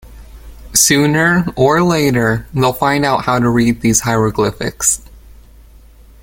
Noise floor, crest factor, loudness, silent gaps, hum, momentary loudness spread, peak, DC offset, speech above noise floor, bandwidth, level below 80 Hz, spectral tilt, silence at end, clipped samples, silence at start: -41 dBFS; 14 dB; -13 LUFS; none; none; 6 LU; 0 dBFS; under 0.1%; 28 dB; 17 kHz; -38 dBFS; -4 dB/octave; 1.05 s; under 0.1%; 0.05 s